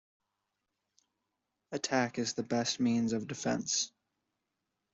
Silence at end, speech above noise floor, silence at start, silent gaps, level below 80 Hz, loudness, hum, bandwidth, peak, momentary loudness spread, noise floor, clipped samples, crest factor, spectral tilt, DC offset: 1.05 s; 53 dB; 1.7 s; none; -74 dBFS; -33 LUFS; none; 8 kHz; -16 dBFS; 7 LU; -86 dBFS; under 0.1%; 20 dB; -3.5 dB/octave; under 0.1%